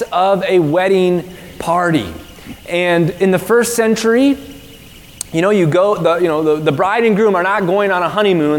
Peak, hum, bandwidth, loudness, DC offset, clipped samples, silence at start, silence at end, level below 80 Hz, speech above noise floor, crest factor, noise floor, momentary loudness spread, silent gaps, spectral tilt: 0 dBFS; none; 18 kHz; -14 LUFS; 0.1%; under 0.1%; 0 s; 0 s; -46 dBFS; 24 dB; 14 dB; -38 dBFS; 11 LU; none; -5.5 dB/octave